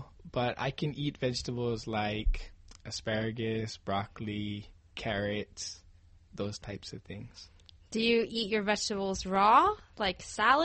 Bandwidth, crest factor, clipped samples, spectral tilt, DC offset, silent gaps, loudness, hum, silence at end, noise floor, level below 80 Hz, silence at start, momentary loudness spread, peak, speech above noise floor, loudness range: 8.4 kHz; 22 dB; under 0.1%; -4.5 dB/octave; under 0.1%; none; -32 LUFS; none; 0 s; -58 dBFS; -44 dBFS; 0 s; 17 LU; -10 dBFS; 27 dB; 9 LU